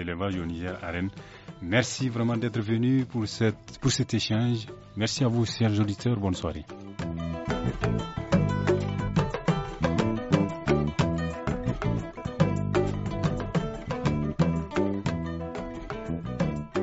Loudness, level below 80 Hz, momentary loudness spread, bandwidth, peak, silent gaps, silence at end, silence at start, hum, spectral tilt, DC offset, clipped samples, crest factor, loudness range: -28 LUFS; -44 dBFS; 9 LU; 8 kHz; -6 dBFS; none; 0 s; 0 s; none; -6 dB/octave; under 0.1%; under 0.1%; 22 dB; 2 LU